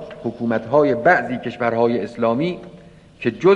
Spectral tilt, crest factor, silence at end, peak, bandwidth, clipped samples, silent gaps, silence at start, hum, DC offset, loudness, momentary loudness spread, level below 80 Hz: -7.5 dB/octave; 16 dB; 0 s; -2 dBFS; 8.4 kHz; under 0.1%; none; 0 s; none; under 0.1%; -19 LUFS; 10 LU; -54 dBFS